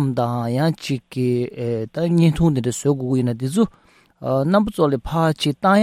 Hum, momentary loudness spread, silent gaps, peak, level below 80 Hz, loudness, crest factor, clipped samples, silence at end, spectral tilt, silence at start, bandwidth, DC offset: none; 7 LU; none; -4 dBFS; -44 dBFS; -20 LUFS; 16 dB; under 0.1%; 0 s; -6.5 dB/octave; 0 s; 15 kHz; under 0.1%